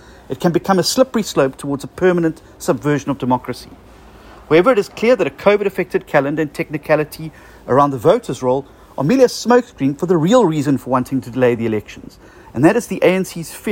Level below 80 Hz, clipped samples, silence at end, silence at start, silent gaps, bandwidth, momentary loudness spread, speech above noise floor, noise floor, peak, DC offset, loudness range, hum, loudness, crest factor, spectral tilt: -48 dBFS; under 0.1%; 0 s; 0.3 s; none; 16.5 kHz; 12 LU; 25 dB; -41 dBFS; 0 dBFS; under 0.1%; 2 LU; none; -16 LUFS; 16 dB; -5.5 dB/octave